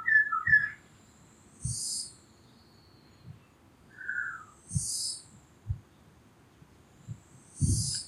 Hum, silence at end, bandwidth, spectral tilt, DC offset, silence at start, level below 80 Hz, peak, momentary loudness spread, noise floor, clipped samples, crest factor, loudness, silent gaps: none; 0 s; 15.5 kHz; -2 dB/octave; under 0.1%; 0 s; -50 dBFS; -12 dBFS; 27 LU; -59 dBFS; under 0.1%; 22 dB; -30 LUFS; none